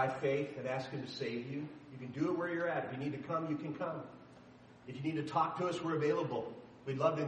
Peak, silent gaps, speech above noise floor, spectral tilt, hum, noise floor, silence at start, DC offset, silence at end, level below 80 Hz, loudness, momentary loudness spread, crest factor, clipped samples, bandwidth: -18 dBFS; none; 21 dB; -7 dB/octave; none; -58 dBFS; 0 s; under 0.1%; 0 s; -76 dBFS; -38 LUFS; 14 LU; 20 dB; under 0.1%; 9.4 kHz